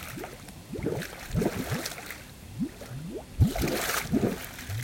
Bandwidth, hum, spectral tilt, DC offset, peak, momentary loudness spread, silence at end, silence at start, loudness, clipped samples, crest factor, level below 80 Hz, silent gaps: 17 kHz; none; -5 dB/octave; under 0.1%; -12 dBFS; 14 LU; 0 s; 0 s; -31 LUFS; under 0.1%; 20 dB; -42 dBFS; none